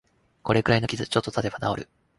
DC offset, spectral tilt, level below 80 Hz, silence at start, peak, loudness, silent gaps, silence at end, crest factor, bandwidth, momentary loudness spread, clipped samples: under 0.1%; -5.5 dB/octave; -50 dBFS; 0.45 s; -6 dBFS; -25 LUFS; none; 0.35 s; 20 dB; 11.5 kHz; 10 LU; under 0.1%